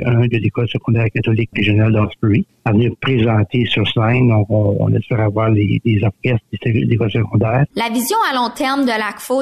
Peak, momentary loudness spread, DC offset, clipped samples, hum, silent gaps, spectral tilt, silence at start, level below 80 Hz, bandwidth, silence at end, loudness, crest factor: -6 dBFS; 4 LU; 0.5%; under 0.1%; none; none; -6.5 dB/octave; 0 s; -42 dBFS; 14 kHz; 0 s; -16 LUFS; 10 dB